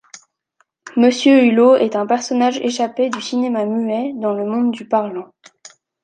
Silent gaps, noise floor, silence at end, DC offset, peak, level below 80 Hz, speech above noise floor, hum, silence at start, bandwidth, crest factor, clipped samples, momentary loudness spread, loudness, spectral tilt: none; -64 dBFS; 0.8 s; under 0.1%; -2 dBFS; -70 dBFS; 48 dB; none; 0.15 s; 9.2 kHz; 16 dB; under 0.1%; 10 LU; -16 LUFS; -4.5 dB/octave